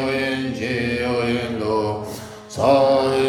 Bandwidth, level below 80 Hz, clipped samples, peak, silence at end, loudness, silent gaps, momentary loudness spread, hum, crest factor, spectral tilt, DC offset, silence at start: 15 kHz; -50 dBFS; under 0.1%; -4 dBFS; 0 s; -20 LUFS; none; 14 LU; none; 16 dB; -5.5 dB/octave; under 0.1%; 0 s